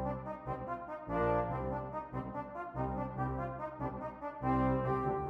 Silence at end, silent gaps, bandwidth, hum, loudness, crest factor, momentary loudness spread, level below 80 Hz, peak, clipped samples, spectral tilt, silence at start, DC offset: 0 s; none; 5.2 kHz; none; -37 LUFS; 16 dB; 10 LU; -50 dBFS; -20 dBFS; under 0.1%; -10 dB/octave; 0 s; under 0.1%